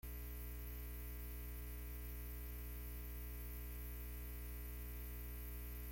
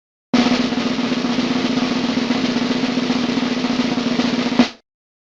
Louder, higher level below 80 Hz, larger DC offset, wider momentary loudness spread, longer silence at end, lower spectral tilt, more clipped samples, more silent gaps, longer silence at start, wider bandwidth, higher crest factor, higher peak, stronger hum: second, -50 LUFS vs -19 LUFS; about the same, -50 dBFS vs -50 dBFS; neither; second, 0 LU vs 3 LU; second, 0 s vs 0.6 s; about the same, -5 dB/octave vs -4.5 dB/octave; neither; neither; second, 0.05 s vs 0.35 s; first, 17 kHz vs 7.8 kHz; second, 10 dB vs 20 dB; second, -38 dBFS vs 0 dBFS; first, 60 Hz at -50 dBFS vs none